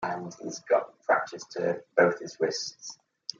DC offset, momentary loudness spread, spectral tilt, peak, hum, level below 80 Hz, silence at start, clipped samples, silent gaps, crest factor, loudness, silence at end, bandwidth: under 0.1%; 15 LU; -3.5 dB/octave; -8 dBFS; none; -78 dBFS; 0 s; under 0.1%; none; 22 dB; -28 LUFS; 0.45 s; 7.6 kHz